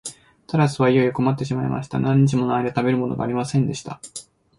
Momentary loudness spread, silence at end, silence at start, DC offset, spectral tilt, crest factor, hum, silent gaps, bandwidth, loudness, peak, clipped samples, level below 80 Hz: 16 LU; 0.35 s; 0.05 s; under 0.1%; -7 dB/octave; 16 dB; none; none; 11.5 kHz; -21 LUFS; -6 dBFS; under 0.1%; -54 dBFS